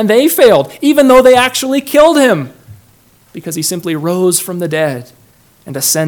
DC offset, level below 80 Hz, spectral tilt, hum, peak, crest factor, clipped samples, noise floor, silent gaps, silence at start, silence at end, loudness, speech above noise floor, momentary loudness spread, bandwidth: under 0.1%; -46 dBFS; -4 dB/octave; none; 0 dBFS; 12 dB; 2%; -47 dBFS; none; 0 s; 0 s; -10 LUFS; 37 dB; 13 LU; 19.5 kHz